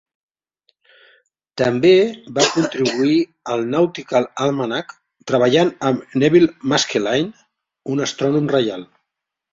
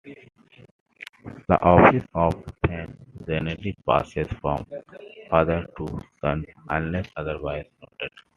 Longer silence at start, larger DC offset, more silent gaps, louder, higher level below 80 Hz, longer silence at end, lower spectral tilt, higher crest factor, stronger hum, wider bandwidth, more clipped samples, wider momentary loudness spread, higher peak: first, 1.55 s vs 0.05 s; neither; second, none vs 0.71-0.86 s, 1.09-1.13 s; first, -18 LUFS vs -24 LUFS; second, -60 dBFS vs -44 dBFS; first, 0.7 s vs 0.3 s; second, -5 dB/octave vs -8.5 dB/octave; second, 18 dB vs 24 dB; neither; second, 7.8 kHz vs 10 kHz; neither; second, 11 LU vs 23 LU; about the same, -2 dBFS vs 0 dBFS